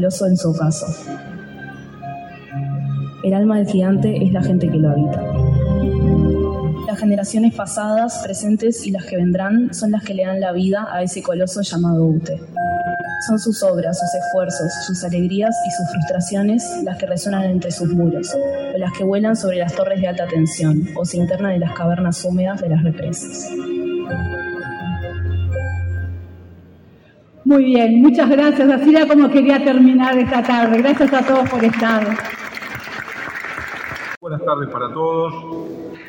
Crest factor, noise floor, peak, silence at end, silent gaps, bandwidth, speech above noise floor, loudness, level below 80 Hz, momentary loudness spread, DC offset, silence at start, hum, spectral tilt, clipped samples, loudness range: 16 dB; -47 dBFS; 0 dBFS; 0 s; 34.17-34.21 s; 16.5 kHz; 31 dB; -17 LUFS; -40 dBFS; 14 LU; under 0.1%; 0 s; none; -6.5 dB/octave; under 0.1%; 10 LU